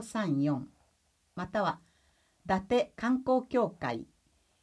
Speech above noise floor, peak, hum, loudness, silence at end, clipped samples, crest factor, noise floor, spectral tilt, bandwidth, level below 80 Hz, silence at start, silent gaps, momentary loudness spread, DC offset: 41 dB; -14 dBFS; none; -32 LUFS; 0.6 s; under 0.1%; 18 dB; -72 dBFS; -6.5 dB/octave; 11 kHz; -62 dBFS; 0 s; none; 15 LU; under 0.1%